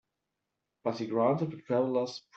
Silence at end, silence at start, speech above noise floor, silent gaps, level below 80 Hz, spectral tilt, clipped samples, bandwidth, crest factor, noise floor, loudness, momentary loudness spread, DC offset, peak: 0.15 s; 0.85 s; 55 dB; none; -78 dBFS; -7 dB/octave; under 0.1%; 8 kHz; 20 dB; -86 dBFS; -31 LUFS; 8 LU; under 0.1%; -14 dBFS